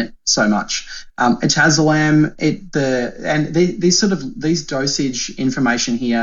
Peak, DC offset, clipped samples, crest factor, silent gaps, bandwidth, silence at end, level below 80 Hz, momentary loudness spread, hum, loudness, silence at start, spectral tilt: -2 dBFS; under 0.1%; under 0.1%; 14 dB; none; 7.8 kHz; 0 s; -44 dBFS; 7 LU; none; -17 LUFS; 0 s; -4 dB/octave